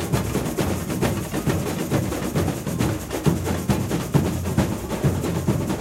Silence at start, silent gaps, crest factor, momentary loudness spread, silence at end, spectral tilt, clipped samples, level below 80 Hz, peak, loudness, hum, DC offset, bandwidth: 0 s; none; 18 dB; 2 LU; 0 s; -6 dB/octave; under 0.1%; -38 dBFS; -6 dBFS; -24 LUFS; none; under 0.1%; 16 kHz